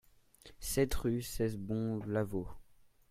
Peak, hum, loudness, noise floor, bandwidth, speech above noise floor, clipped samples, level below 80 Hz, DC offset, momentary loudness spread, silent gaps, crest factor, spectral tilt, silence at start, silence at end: -18 dBFS; none; -36 LUFS; -61 dBFS; 16 kHz; 26 dB; under 0.1%; -48 dBFS; under 0.1%; 8 LU; none; 20 dB; -5.5 dB/octave; 0.45 s; 0.35 s